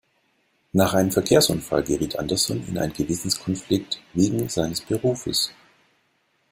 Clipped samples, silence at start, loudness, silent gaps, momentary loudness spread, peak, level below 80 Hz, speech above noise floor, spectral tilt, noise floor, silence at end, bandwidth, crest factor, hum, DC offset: under 0.1%; 0.75 s; -23 LUFS; none; 8 LU; -4 dBFS; -50 dBFS; 45 dB; -4.5 dB/octave; -68 dBFS; 1 s; 16.5 kHz; 20 dB; none; under 0.1%